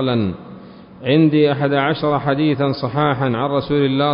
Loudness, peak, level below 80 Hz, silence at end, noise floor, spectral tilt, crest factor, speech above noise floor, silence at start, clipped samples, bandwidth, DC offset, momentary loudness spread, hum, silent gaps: -17 LUFS; -2 dBFS; -48 dBFS; 0 s; -38 dBFS; -12 dB/octave; 14 dB; 22 dB; 0 s; under 0.1%; 5.4 kHz; under 0.1%; 9 LU; none; none